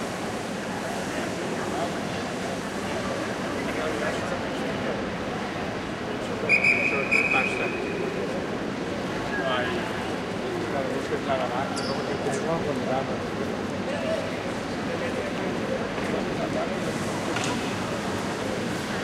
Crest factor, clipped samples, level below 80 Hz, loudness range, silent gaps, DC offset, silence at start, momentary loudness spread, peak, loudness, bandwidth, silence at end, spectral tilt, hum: 18 dB; under 0.1%; -52 dBFS; 5 LU; none; under 0.1%; 0 s; 8 LU; -10 dBFS; -27 LUFS; 16 kHz; 0 s; -4.5 dB/octave; none